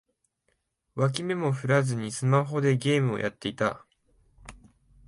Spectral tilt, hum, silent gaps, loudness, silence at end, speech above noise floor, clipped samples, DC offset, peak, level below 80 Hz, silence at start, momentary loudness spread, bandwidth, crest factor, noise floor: -6 dB/octave; none; none; -27 LUFS; 0.5 s; 49 dB; under 0.1%; under 0.1%; -8 dBFS; -60 dBFS; 0.95 s; 6 LU; 11.5 kHz; 20 dB; -75 dBFS